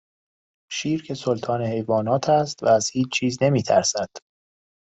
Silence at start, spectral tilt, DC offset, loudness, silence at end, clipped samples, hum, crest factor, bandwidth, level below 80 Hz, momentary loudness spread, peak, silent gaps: 0.7 s; -4.5 dB/octave; under 0.1%; -22 LUFS; 0.75 s; under 0.1%; none; 18 dB; 8.4 kHz; -62 dBFS; 8 LU; -6 dBFS; none